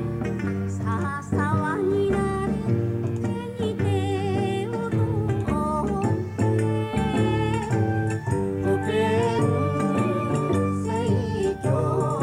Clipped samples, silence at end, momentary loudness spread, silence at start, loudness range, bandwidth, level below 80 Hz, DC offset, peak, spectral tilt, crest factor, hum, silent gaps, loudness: under 0.1%; 0 s; 4 LU; 0 s; 2 LU; 12 kHz; -44 dBFS; under 0.1%; -10 dBFS; -7.5 dB/octave; 14 dB; none; none; -24 LUFS